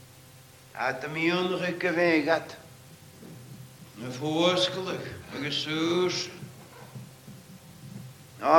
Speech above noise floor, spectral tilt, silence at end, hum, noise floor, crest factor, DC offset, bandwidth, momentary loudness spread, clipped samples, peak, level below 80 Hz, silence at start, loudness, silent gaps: 24 dB; -4.5 dB/octave; 0 s; none; -52 dBFS; 24 dB; under 0.1%; 17.5 kHz; 24 LU; under 0.1%; -4 dBFS; -68 dBFS; 0 s; -28 LUFS; none